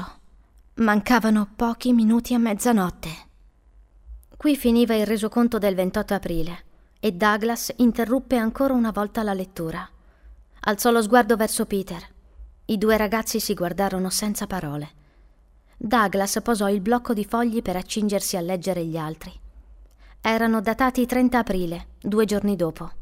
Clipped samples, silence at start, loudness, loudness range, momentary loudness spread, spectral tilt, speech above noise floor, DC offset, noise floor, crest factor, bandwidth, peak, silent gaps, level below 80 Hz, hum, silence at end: under 0.1%; 0 s; -22 LUFS; 3 LU; 13 LU; -5 dB/octave; 33 dB; under 0.1%; -55 dBFS; 20 dB; 16 kHz; -4 dBFS; none; -44 dBFS; none; 0 s